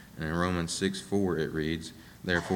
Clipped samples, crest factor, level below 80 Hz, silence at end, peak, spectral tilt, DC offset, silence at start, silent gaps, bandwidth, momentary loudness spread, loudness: under 0.1%; 20 dB; -52 dBFS; 0 s; -12 dBFS; -5 dB/octave; under 0.1%; 0 s; none; 19 kHz; 7 LU; -31 LUFS